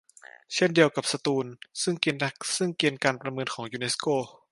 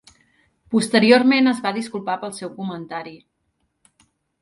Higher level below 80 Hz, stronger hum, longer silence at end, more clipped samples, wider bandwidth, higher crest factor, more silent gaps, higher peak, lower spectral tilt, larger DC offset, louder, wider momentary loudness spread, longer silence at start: second, -74 dBFS vs -66 dBFS; neither; second, 0.2 s vs 1.25 s; neither; about the same, 11.5 kHz vs 11.5 kHz; about the same, 22 dB vs 20 dB; neither; second, -6 dBFS vs -2 dBFS; about the same, -3.5 dB/octave vs -4.5 dB/octave; neither; second, -27 LUFS vs -19 LUFS; second, 10 LU vs 18 LU; second, 0.5 s vs 0.7 s